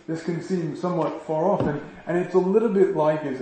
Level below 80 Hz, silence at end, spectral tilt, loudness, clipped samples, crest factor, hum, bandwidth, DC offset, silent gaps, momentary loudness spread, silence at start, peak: -58 dBFS; 0 s; -8 dB/octave; -24 LUFS; under 0.1%; 16 dB; none; 8.6 kHz; under 0.1%; none; 8 LU; 0.1 s; -8 dBFS